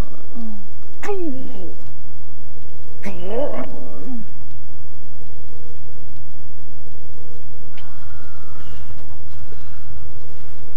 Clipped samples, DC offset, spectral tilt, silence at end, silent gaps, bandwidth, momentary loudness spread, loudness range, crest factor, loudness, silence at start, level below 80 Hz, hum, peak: under 0.1%; 50%; -7.5 dB/octave; 0 s; none; 16 kHz; 16 LU; 11 LU; 22 dB; -35 LUFS; 0 s; -44 dBFS; none; -4 dBFS